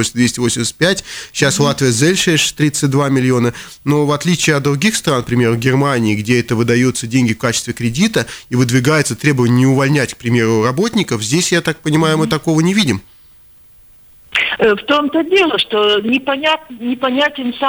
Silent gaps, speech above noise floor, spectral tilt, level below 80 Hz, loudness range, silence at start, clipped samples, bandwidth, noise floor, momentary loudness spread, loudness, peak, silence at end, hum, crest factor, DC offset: none; 30 dB; -4.5 dB/octave; -46 dBFS; 2 LU; 0 s; under 0.1%; over 20 kHz; -44 dBFS; 5 LU; -14 LUFS; -2 dBFS; 0 s; none; 12 dB; under 0.1%